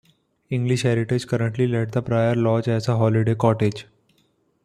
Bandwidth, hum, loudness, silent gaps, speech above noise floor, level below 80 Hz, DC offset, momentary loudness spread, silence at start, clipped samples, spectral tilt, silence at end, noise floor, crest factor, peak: 10.5 kHz; none; -22 LUFS; none; 44 dB; -56 dBFS; under 0.1%; 5 LU; 0.5 s; under 0.1%; -7.5 dB/octave; 0.85 s; -65 dBFS; 18 dB; -4 dBFS